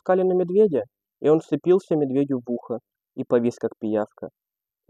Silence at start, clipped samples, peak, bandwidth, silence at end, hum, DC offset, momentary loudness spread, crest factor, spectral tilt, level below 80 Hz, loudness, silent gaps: 0.05 s; under 0.1%; -6 dBFS; 9 kHz; 0.6 s; none; under 0.1%; 15 LU; 16 dB; -8.5 dB/octave; -74 dBFS; -23 LUFS; none